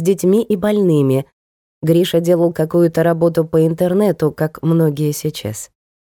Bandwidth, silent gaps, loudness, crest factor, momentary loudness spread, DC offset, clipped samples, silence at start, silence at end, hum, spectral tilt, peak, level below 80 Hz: 18 kHz; 1.33-1.81 s; -16 LUFS; 12 dB; 9 LU; under 0.1%; under 0.1%; 0 s; 0.45 s; none; -7 dB/octave; -4 dBFS; -52 dBFS